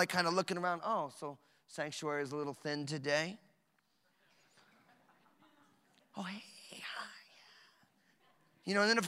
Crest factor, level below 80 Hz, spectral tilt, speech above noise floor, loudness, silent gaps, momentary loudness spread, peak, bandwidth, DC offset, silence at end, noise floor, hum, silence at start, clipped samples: 26 dB; -90 dBFS; -4 dB/octave; 41 dB; -38 LUFS; none; 19 LU; -14 dBFS; 16 kHz; under 0.1%; 0 s; -77 dBFS; none; 0 s; under 0.1%